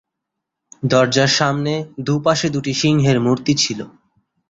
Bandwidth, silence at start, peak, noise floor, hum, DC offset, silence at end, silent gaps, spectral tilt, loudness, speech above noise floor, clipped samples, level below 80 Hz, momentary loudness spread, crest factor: 7.8 kHz; 0.8 s; -2 dBFS; -80 dBFS; none; under 0.1%; 0.6 s; none; -4.5 dB/octave; -17 LUFS; 63 dB; under 0.1%; -52 dBFS; 9 LU; 16 dB